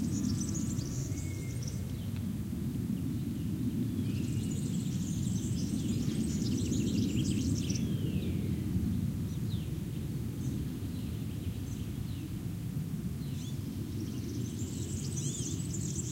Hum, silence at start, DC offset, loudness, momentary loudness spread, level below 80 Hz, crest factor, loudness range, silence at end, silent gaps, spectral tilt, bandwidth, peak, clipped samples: none; 0 s; under 0.1%; -35 LUFS; 6 LU; -48 dBFS; 16 dB; 5 LU; 0 s; none; -6 dB/octave; 16 kHz; -18 dBFS; under 0.1%